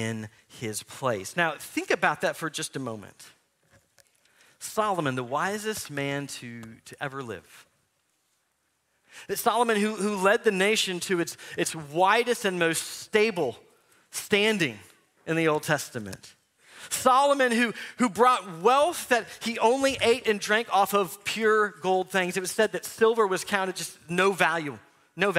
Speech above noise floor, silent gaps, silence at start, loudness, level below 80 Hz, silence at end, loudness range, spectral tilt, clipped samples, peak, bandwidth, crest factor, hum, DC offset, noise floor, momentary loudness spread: 47 dB; none; 0 s; -26 LUFS; -68 dBFS; 0 s; 8 LU; -3.5 dB/octave; under 0.1%; -4 dBFS; 16 kHz; 22 dB; none; under 0.1%; -74 dBFS; 15 LU